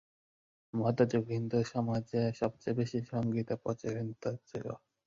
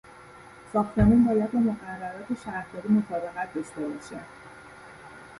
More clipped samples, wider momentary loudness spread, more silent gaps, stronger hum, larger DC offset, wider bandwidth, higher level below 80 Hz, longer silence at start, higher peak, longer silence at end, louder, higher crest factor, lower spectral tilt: neither; second, 10 LU vs 25 LU; neither; neither; neither; second, 7.6 kHz vs 11.5 kHz; second, -66 dBFS vs -44 dBFS; first, 0.75 s vs 0.15 s; second, -14 dBFS vs -8 dBFS; first, 0.3 s vs 0 s; second, -35 LUFS vs -26 LUFS; about the same, 20 dB vs 20 dB; about the same, -8 dB/octave vs -8.5 dB/octave